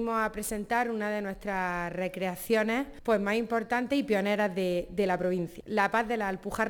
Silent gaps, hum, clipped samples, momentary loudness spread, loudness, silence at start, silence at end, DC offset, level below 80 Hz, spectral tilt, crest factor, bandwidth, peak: none; none; under 0.1%; 6 LU; -30 LUFS; 0 s; 0 s; under 0.1%; -54 dBFS; -5 dB/octave; 18 dB; 19.5 kHz; -12 dBFS